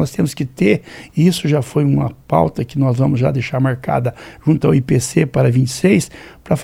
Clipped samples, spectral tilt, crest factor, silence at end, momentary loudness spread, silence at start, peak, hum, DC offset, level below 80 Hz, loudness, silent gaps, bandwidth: under 0.1%; -6.5 dB/octave; 16 dB; 0 s; 6 LU; 0 s; 0 dBFS; none; under 0.1%; -44 dBFS; -16 LUFS; none; 15.5 kHz